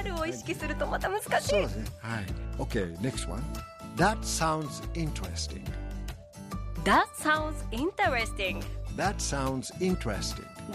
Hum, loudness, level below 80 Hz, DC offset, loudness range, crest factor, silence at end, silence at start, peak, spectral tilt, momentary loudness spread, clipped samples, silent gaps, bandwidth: none; -31 LUFS; -40 dBFS; under 0.1%; 3 LU; 20 dB; 0 s; 0 s; -10 dBFS; -4.5 dB/octave; 12 LU; under 0.1%; none; 15.5 kHz